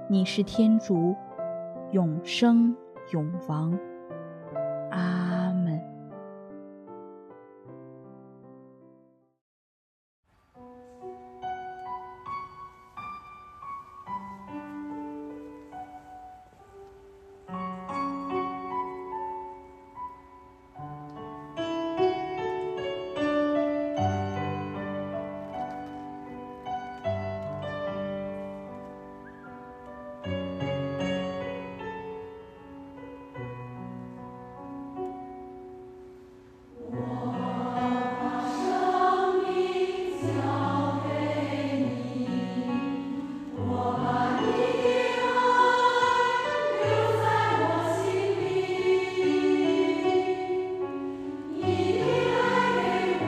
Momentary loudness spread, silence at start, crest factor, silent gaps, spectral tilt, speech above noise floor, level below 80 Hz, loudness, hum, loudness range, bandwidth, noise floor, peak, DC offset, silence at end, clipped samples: 20 LU; 0 s; 20 dB; 9.41-10.23 s; -6.5 dB/octave; 36 dB; -62 dBFS; -28 LUFS; none; 16 LU; 12.5 kHz; -60 dBFS; -10 dBFS; under 0.1%; 0 s; under 0.1%